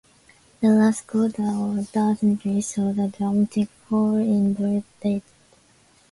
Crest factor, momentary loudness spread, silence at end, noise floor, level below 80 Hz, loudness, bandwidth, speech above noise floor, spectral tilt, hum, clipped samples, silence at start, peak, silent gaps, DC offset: 14 dB; 7 LU; 0.9 s; -57 dBFS; -60 dBFS; -23 LUFS; 11.5 kHz; 36 dB; -7 dB/octave; none; under 0.1%; 0.6 s; -8 dBFS; none; under 0.1%